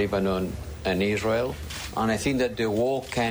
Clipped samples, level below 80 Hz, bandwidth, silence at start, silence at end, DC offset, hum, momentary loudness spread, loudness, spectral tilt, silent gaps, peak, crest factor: under 0.1%; -42 dBFS; over 20 kHz; 0 s; 0 s; under 0.1%; none; 7 LU; -26 LUFS; -5.5 dB/octave; none; -12 dBFS; 14 dB